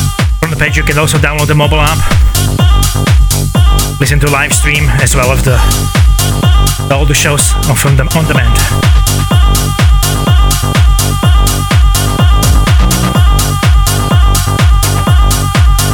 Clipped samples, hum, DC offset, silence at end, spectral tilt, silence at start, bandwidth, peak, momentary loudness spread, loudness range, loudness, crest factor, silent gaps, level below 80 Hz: 0.3%; none; under 0.1%; 0 s; -4.5 dB/octave; 0 s; 19.5 kHz; 0 dBFS; 2 LU; 0 LU; -9 LUFS; 8 dB; none; -10 dBFS